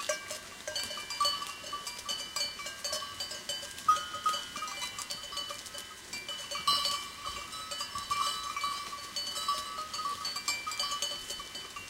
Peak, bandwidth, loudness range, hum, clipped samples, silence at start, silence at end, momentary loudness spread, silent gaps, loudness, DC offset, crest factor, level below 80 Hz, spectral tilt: -14 dBFS; 17 kHz; 1 LU; none; under 0.1%; 0 s; 0 s; 9 LU; none; -34 LUFS; under 0.1%; 22 dB; -64 dBFS; 0.5 dB/octave